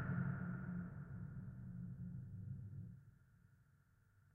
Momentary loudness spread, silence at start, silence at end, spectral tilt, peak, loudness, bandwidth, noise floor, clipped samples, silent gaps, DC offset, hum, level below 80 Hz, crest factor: 12 LU; 0 s; 0.05 s; -7.5 dB/octave; -32 dBFS; -49 LUFS; 2.9 kHz; -73 dBFS; under 0.1%; none; under 0.1%; none; -66 dBFS; 18 dB